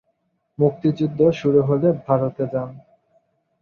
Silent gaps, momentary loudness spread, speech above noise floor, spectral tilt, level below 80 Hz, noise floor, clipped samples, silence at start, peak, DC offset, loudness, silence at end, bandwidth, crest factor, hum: none; 8 LU; 51 dB; -9.5 dB/octave; -58 dBFS; -70 dBFS; under 0.1%; 0.6 s; -4 dBFS; under 0.1%; -20 LUFS; 0.85 s; 6.8 kHz; 18 dB; none